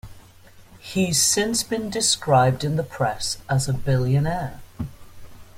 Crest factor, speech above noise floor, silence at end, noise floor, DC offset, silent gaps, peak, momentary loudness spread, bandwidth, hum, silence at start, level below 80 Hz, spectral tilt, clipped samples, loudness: 20 dB; 26 dB; 0 s; -48 dBFS; under 0.1%; none; -4 dBFS; 17 LU; 16.5 kHz; none; 0.05 s; -44 dBFS; -4 dB/octave; under 0.1%; -21 LUFS